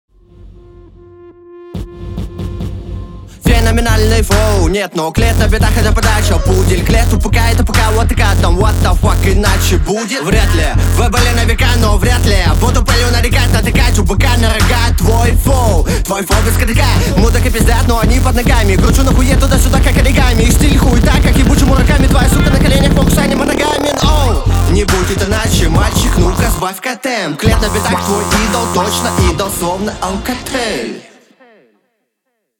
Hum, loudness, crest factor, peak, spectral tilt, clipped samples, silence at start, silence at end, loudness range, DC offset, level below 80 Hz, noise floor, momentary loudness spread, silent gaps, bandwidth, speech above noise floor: none; -12 LUFS; 10 dB; 0 dBFS; -5 dB/octave; under 0.1%; 0.45 s; 1.6 s; 5 LU; under 0.1%; -14 dBFS; -69 dBFS; 7 LU; none; over 20 kHz; 59 dB